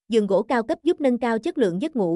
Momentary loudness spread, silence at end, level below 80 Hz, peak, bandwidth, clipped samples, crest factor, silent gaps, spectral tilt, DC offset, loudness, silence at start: 3 LU; 0 s; -62 dBFS; -8 dBFS; 11.5 kHz; under 0.1%; 14 dB; none; -6.5 dB/octave; under 0.1%; -22 LUFS; 0.1 s